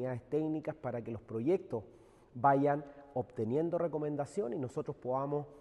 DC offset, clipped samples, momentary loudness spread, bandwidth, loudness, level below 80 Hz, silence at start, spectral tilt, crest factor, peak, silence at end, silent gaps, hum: under 0.1%; under 0.1%; 11 LU; 11 kHz; -36 LUFS; -70 dBFS; 0 s; -9 dB/octave; 20 dB; -16 dBFS; 0 s; none; none